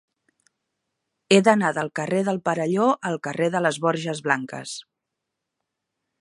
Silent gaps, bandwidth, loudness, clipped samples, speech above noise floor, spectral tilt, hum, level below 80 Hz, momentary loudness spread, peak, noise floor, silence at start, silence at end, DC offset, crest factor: none; 11.5 kHz; -22 LUFS; under 0.1%; 60 dB; -5 dB/octave; none; -74 dBFS; 12 LU; -2 dBFS; -82 dBFS; 1.3 s; 1.4 s; under 0.1%; 22 dB